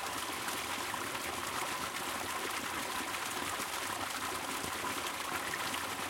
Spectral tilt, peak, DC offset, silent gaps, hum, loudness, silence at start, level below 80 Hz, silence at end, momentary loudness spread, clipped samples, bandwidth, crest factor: -1.5 dB/octave; -22 dBFS; under 0.1%; none; none; -36 LUFS; 0 s; -66 dBFS; 0 s; 1 LU; under 0.1%; 17 kHz; 16 dB